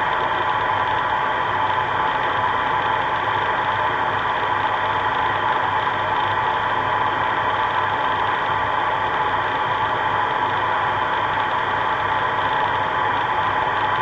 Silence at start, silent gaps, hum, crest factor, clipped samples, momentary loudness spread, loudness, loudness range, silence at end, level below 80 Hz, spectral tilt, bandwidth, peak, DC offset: 0 s; none; none; 14 dB; under 0.1%; 1 LU; -20 LUFS; 0 LU; 0 s; -48 dBFS; -5 dB/octave; 8 kHz; -8 dBFS; under 0.1%